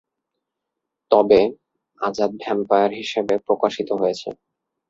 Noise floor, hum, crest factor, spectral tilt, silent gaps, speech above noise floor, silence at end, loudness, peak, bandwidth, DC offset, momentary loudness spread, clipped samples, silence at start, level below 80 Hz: -82 dBFS; none; 20 dB; -5.5 dB/octave; none; 62 dB; 0.55 s; -20 LUFS; -2 dBFS; 7.8 kHz; under 0.1%; 11 LU; under 0.1%; 1.1 s; -58 dBFS